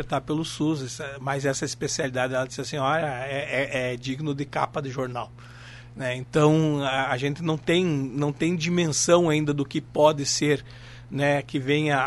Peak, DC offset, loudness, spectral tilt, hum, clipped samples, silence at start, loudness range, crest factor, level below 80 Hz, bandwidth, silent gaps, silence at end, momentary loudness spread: -6 dBFS; under 0.1%; -25 LUFS; -4.5 dB/octave; none; under 0.1%; 0 s; 5 LU; 20 dB; -54 dBFS; 11.5 kHz; none; 0 s; 12 LU